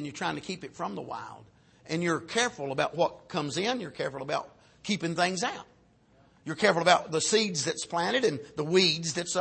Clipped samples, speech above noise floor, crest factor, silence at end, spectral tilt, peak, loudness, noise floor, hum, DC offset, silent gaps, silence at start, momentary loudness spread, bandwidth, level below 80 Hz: under 0.1%; 33 dB; 22 dB; 0 s; -3.5 dB/octave; -8 dBFS; -28 LUFS; -62 dBFS; none; under 0.1%; none; 0 s; 15 LU; 8.8 kHz; -68 dBFS